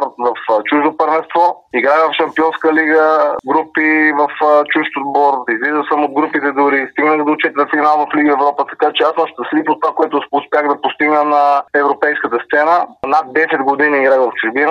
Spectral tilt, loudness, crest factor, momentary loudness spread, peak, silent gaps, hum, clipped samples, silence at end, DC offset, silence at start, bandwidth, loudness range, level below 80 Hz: -5.5 dB/octave; -13 LUFS; 12 dB; 5 LU; 0 dBFS; none; none; under 0.1%; 0 s; under 0.1%; 0 s; 6.8 kHz; 2 LU; -62 dBFS